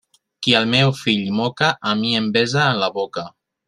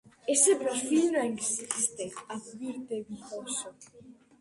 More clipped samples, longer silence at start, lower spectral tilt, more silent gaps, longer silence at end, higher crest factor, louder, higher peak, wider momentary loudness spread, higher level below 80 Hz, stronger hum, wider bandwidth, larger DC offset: neither; first, 0.4 s vs 0.25 s; first, -5 dB/octave vs -2 dB/octave; neither; about the same, 0.4 s vs 0.3 s; about the same, 20 dB vs 20 dB; first, -18 LUFS vs -29 LUFS; first, 0 dBFS vs -10 dBFS; second, 10 LU vs 17 LU; first, -58 dBFS vs -74 dBFS; neither; about the same, 12 kHz vs 11.5 kHz; neither